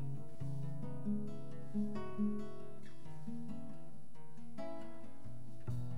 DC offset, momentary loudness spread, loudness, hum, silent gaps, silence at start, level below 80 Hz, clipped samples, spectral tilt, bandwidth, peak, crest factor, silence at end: 1%; 15 LU; -46 LUFS; none; none; 0 s; -68 dBFS; under 0.1%; -8.5 dB/octave; 12 kHz; -26 dBFS; 16 dB; 0 s